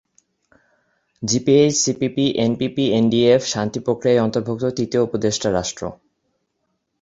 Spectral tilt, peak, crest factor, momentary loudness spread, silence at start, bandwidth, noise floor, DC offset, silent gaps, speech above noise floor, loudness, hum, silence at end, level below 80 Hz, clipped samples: -4.5 dB/octave; -2 dBFS; 18 dB; 8 LU; 1.2 s; 8 kHz; -72 dBFS; under 0.1%; none; 54 dB; -19 LUFS; none; 1.1 s; -52 dBFS; under 0.1%